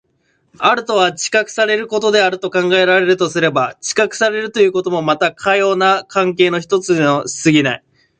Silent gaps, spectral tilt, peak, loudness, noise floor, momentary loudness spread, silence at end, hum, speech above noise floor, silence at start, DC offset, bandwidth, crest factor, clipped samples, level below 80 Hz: none; -4 dB/octave; 0 dBFS; -14 LUFS; -62 dBFS; 4 LU; 0.4 s; none; 47 dB; 0.6 s; under 0.1%; 9.6 kHz; 14 dB; under 0.1%; -60 dBFS